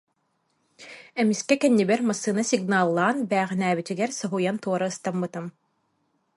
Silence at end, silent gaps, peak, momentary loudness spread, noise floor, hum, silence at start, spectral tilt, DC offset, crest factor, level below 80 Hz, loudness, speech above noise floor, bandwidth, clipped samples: 0.85 s; none; -6 dBFS; 12 LU; -72 dBFS; none; 0.8 s; -5 dB/octave; under 0.1%; 20 dB; -72 dBFS; -24 LUFS; 48 dB; 11.5 kHz; under 0.1%